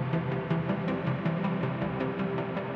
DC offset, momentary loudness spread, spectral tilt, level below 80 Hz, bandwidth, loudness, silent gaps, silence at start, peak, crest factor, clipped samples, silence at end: under 0.1%; 2 LU; -9.5 dB/octave; -58 dBFS; 5.6 kHz; -31 LUFS; none; 0 s; -16 dBFS; 14 dB; under 0.1%; 0 s